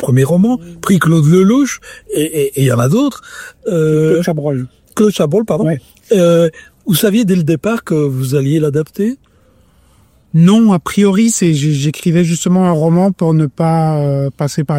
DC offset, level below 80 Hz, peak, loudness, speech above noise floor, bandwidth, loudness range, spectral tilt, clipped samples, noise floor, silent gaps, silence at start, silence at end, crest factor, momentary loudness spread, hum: under 0.1%; -48 dBFS; 0 dBFS; -13 LUFS; 38 dB; 16.5 kHz; 3 LU; -6.5 dB/octave; under 0.1%; -50 dBFS; none; 0 s; 0 s; 12 dB; 9 LU; none